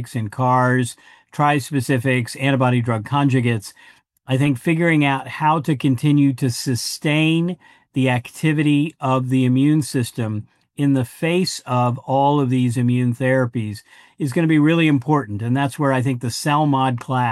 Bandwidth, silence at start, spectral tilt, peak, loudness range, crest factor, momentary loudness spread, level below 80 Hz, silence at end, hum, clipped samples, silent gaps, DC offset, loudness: 12.5 kHz; 0 s; -6.5 dB/octave; -4 dBFS; 1 LU; 16 dB; 8 LU; -64 dBFS; 0 s; none; under 0.1%; none; under 0.1%; -19 LUFS